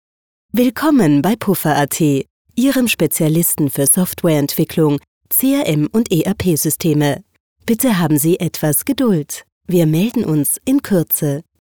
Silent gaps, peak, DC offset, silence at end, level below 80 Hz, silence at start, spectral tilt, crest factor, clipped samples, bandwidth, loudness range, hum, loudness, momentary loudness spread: 2.30-2.45 s, 5.08-5.21 s, 7.40-7.56 s, 9.52-9.61 s; -2 dBFS; 0.2%; 0.2 s; -50 dBFS; 0.55 s; -5 dB/octave; 14 dB; under 0.1%; over 20 kHz; 2 LU; none; -15 LUFS; 6 LU